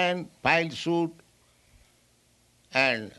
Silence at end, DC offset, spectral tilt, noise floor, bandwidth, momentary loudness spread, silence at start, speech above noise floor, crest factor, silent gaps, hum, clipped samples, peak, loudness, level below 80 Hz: 0.1 s; under 0.1%; -5 dB/octave; -64 dBFS; 12 kHz; 5 LU; 0 s; 37 dB; 22 dB; none; none; under 0.1%; -6 dBFS; -26 LUFS; -64 dBFS